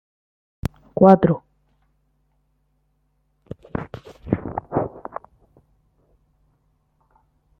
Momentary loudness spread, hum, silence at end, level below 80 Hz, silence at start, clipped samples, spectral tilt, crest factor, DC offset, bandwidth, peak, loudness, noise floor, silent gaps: 25 LU; none; 2.6 s; -48 dBFS; 0.65 s; under 0.1%; -10 dB/octave; 22 dB; under 0.1%; 6 kHz; -2 dBFS; -21 LUFS; -67 dBFS; none